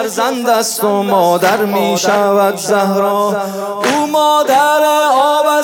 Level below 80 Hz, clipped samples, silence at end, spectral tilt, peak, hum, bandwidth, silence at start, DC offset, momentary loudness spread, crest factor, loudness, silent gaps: -66 dBFS; under 0.1%; 0 s; -3.5 dB/octave; 0 dBFS; none; 18 kHz; 0 s; under 0.1%; 5 LU; 12 dB; -12 LUFS; none